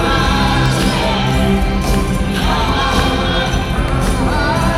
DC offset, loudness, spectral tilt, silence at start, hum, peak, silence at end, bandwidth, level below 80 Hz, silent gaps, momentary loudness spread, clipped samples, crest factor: under 0.1%; -15 LUFS; -5 dB/octave; 0 s; none; 0 dBFS; 0 s; 15.5 kHz; -20 dBFS; none; 3 LU; under 0.1%; 14 dB